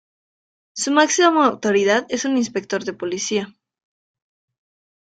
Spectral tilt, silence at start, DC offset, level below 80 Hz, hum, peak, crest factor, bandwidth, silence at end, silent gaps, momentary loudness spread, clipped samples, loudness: -3 dB/octave; 0.75 s; under 0.1%; -66 dBFS; none; -2 dBFS; 20 dB; 9.4 kHz; 1.65 s; none; 11 LU; under 0.1%; -19 LUFS